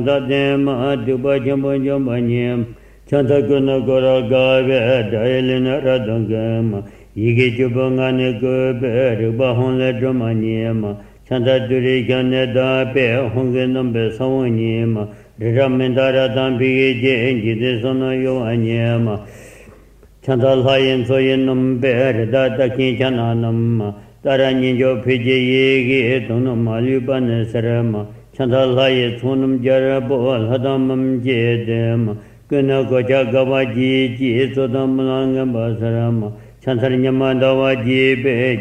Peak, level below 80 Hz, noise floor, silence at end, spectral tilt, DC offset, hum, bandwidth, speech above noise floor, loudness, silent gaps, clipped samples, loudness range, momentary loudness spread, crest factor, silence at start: -2 dBFS; -46 dBFS; -45 dBFS; 0 s; -8 dB/octave; under 0.1%; none; 8.8 kHz; 29 dB; -17 LUFS; none; under 0.1%; 2 LU; 5 LU; 16 dB; 0 s